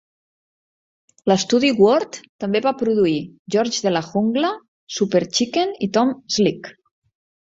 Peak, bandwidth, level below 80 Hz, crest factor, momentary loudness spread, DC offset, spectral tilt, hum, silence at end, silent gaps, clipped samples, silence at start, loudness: -2 dBFS; 7.8 kHz; -62 dBFS; 18 dB; 11 LU; under 0.1%; -4.5 dB/octave; none; 0.75 s; 2.29-2.39 s, 3.39-3.45 s, 4.68-4.87 s; under 0.1%; 1.25 s; -19 LUFS